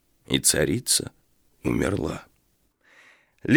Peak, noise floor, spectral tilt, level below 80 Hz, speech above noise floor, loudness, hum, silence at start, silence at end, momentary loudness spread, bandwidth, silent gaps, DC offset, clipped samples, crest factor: -4 dBFS; -67 dBFS; -3 dB/octave; -48 dBFS; 43 dB; -23 LUFS; none; 0.3 s; 0 s; 16 LU; over 20 kHz; none; under 0.1%; under 0.1%; 22 dB